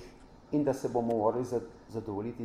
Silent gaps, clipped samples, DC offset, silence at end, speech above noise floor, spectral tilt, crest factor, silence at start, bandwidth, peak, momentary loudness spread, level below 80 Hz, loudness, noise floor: none; under 0.1%; under 0.1%; 0 s; 21 dB; -7.5 dB/octave; 16 dB; 0 s; 14.5 kHz; -16 dBFS; 12 LU; -60 dBFS; -32 LUFS; -53 dBFS